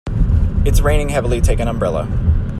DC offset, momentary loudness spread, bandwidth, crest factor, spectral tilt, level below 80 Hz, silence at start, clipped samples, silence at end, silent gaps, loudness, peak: under 0.1%; 3 LU; 13.5 kHz; 12 dB; -6.5 dB/octave; -18 dBFS; 0.05 s; under 0.1%; 0 s; none; -17 LUFS; -2 dBFS